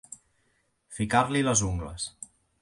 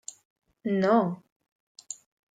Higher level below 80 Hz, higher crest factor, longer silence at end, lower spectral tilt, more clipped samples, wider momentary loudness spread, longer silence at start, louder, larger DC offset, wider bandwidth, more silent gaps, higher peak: first, -46 dBFS vs -76 dBFS; about the same, 22 dB vs 20 dB; about the same, 0.35 s vs 0.4 s; second, -4 dB/octave vs -6 dB/octave; neither; first, 22 LU vs 19 LU; second, 0.1 s vs 0.65 s; about the same, -27 LUFS vs -26 LUFS; neither; first, 11.5 kHz vs 9.6 kHz; second, none vs 1.32-1.40 s, 1.52-1.75 s; about the same, -8 dBFS vs -10 dBFS